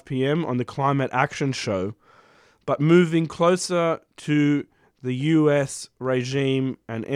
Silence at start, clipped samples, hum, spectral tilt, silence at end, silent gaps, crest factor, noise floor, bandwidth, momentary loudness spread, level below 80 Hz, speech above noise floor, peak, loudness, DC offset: 0.1 s; under 0.1%; none; -6 dB/octave; 0 s; none; 18 dB; -56 dBFS; 13 kHz; 12 LU; -64 dBFS; 34 dB; -4 dBFS; -23 LUFS; under 0.1%